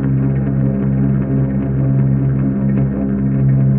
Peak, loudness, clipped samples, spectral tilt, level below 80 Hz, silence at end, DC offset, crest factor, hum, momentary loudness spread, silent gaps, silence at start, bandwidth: -4 dBFS; -16 LUFS; under 0.1%; -12.5 dB/octave; -30 dBFS; 0 s; under 0.1%; 10 dB; none; 2 LU; none; 0 s; 2.8 kHz